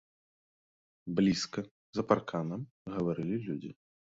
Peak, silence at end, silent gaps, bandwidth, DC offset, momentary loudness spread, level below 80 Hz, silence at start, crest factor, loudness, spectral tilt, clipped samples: -12 dBFS; 0.4 s; 1.71-1.93 s, 2.71-2.85 s; 7.8 kHz; under 0.1%; 12 LU; -66 dBFS; 1.05 s; 24 dB; -34 LUFS; -6 dB/octave; under 0.1%